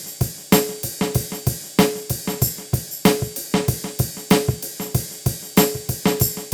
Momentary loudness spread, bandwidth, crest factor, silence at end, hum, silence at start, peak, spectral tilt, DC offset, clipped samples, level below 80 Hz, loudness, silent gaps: 8 LU; over 20 kHz; 20 dB; 0 s; none; 0 s; -2 dBFS; -4.5 dB/octave; under 0.1%; under 0.1%; -40 dBFS; -21 LUFS; none